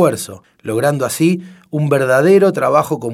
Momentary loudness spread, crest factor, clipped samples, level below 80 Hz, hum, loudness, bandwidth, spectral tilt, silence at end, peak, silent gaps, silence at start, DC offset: 14 LU; 14 dB; under 0.1%; -60 dBFS; none; -14 LUFS; 16 kHz; -6 dB/octave; 0 s; 0 dBFS; none; 0 s; under 0.1%